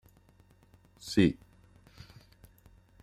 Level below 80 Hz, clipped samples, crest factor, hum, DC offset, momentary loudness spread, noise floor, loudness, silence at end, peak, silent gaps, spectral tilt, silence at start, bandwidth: -58 dBFS; under 0.1%; 26 dB; none; under 0.1%; 27 LU; -62 dBFS; -28 LUFS; 1.7 s; -10 dBFS; none; -6 dB/octave; 1.05 s; 13.5 kHz